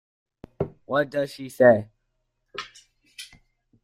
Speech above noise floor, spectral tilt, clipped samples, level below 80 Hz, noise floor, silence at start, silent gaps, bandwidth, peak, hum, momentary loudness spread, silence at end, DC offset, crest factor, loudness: 54 dB; -6 dB/octave; under 0.1%; -62 dBFS; -75 dBFS; 0.6 s; none; 15 kHz; -4 dBFS; none; 24 LU; 0.6 s; under 0.1%; 22 dB; -23 LUFS